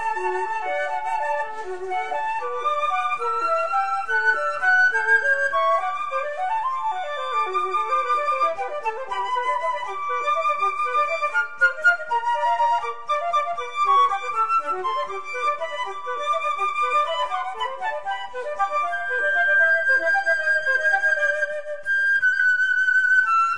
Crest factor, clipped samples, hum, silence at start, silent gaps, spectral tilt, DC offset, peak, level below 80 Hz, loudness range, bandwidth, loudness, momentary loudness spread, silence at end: 16 dB; under 0.1%; none; 0 s; none; -1.5 dB/octave; 1%; -6 dBFS; -62 dBFS; 5 LU; 10.5 kHz; -22 LUFS; 10 LU; 0 s